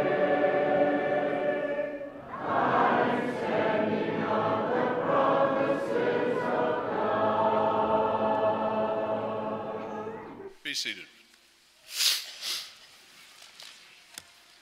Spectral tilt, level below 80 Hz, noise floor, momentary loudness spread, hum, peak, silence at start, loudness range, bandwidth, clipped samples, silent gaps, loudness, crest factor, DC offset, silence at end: -4 dB/octave; -66 dBFS; -60 dBFS; 15 LU; none; -8 dBFS; 0 s; 6 LU; 16 kHz; under 0.1%; none; -28 LUFS; 20 dB; under 0.1%; 0.85 s